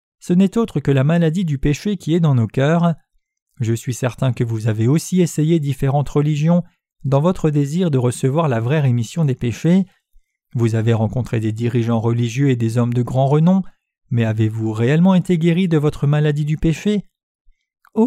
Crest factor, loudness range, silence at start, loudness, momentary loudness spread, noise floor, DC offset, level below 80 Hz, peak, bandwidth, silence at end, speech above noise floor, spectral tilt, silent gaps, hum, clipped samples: 14 dB; 2 LU; 0.25 s; -18 LUFS; 6 LU; -54 dBFS; under 0.1%; -42 dBFS; -4 dBFS; 14 kHz; 0 s; 38 dB; -7.5 dB/octave; 3.42-3.46 s, 17.23-17.45 s; none; under 0.1%